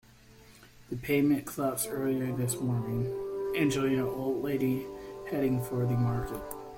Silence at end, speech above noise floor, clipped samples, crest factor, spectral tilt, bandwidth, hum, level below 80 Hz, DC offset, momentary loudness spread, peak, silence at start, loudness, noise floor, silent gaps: 0 s; 26 dB; under 0.1%; 16 dB; -6 dB/octave; 16.5 kHz; none; -54 dBFS; under 0.1%; 9 LU; -16 dBFS; 0.3 s; -31 LUFS; -55 dBFS; none